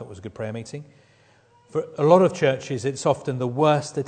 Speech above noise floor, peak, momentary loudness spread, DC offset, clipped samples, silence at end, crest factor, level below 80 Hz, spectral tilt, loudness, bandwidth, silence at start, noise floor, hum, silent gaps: 35 dB; -2 dBFS; 18 LU; under 0.1%; under 0.1%; 0 s; 20 dB; -64 dBFS; -6 dB/octave; -22 LUFS; 9.4 kHz; 0 s; -57 dBFS; none; none